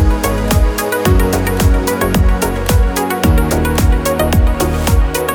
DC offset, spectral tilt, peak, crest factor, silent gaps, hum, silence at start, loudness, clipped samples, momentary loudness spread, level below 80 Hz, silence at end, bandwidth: under 0.1%; -5.5 dB/octave; 0 dBFS; 12 dB; none; none; 0 s; -14 LUFS; under 0.1%; 2 LU; -16 dBFS; 0 s; over 20 kHz